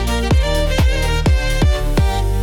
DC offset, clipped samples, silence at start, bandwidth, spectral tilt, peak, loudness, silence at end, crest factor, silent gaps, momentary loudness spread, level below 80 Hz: under 0.1%; under 0.1%; 0 s; 18 kHz; -5.5 dB/octave; -6 dBFS; -17 LUFS; 0 s; 8 dB; none; 1 LU; -16 dBFS